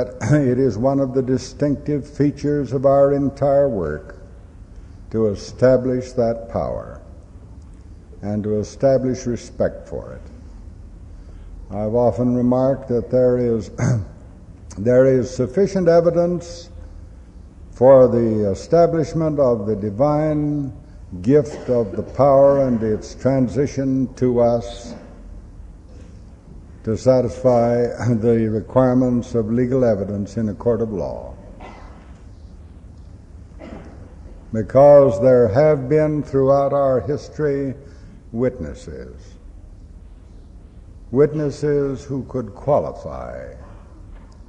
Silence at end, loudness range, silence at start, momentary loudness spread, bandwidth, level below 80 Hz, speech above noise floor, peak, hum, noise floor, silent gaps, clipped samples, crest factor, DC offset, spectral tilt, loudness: 0.05 s; 8 LU; 0 s; 18 LU; 9 kHz; -40 dBFS; 23 dB; -2 dBFS; none; -41 dBFS; none; under 0.1%; 18 dB; under 0.1%; -8 dB/octave; -18 LUFS